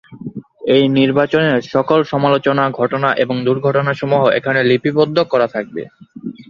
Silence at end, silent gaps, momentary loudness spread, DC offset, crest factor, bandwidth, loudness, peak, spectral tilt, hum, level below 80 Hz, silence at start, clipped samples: 0.1 s; none; 16 LU; under 0.1%; 14 dB; 7 kHz; -15 LUFS; 0 dBFS; -7.5 dB/octave; none; -56 dBFS; 0.1 s; under 0.1%